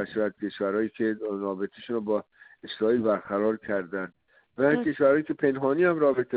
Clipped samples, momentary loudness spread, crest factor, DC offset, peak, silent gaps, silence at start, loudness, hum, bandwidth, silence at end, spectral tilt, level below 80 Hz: under 0.1%; 12 LU; 16 dB; under 0.1%; -10 dBFS; none; 0 s; -27 LUFS; none; 4.8 kHz; 0 s; -5.5 dB/octave; -68 dBFS